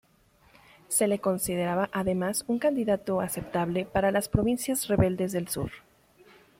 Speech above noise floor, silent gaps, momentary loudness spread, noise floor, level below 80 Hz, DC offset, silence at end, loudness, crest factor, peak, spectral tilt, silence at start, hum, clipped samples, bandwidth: 35 dB; none; 5 LU; -62 dBFS; -48 dBFS; under 0.1%; 0.8 s; -28 LUFS; 20 dB; -8 dBFS; -5 dB/octave; 0.9 s; none; under 0.1%; 16.5 kHz